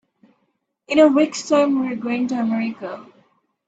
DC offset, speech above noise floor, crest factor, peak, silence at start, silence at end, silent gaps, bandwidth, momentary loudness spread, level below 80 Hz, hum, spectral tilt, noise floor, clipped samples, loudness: under 0.1%; 52 dB; 18 dB; -2 dBFS; 0.9 s; 0.65 s; none; 8 kHz; 16 LU; -66 dBFS; none; -4.5 dB/octave; -70 dBFS; under 0.1%; -19 LUFS